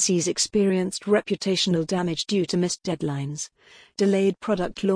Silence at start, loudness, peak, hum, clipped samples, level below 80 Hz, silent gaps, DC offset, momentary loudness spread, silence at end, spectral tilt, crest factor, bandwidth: 0 s; -24 LUFS; -10 dBFS; none; under 0.1%; -56 dBFS; none; under 0.1%; 8 LU; 0 s; -4.5 dB/octave; 14 dB; 10.5 kHz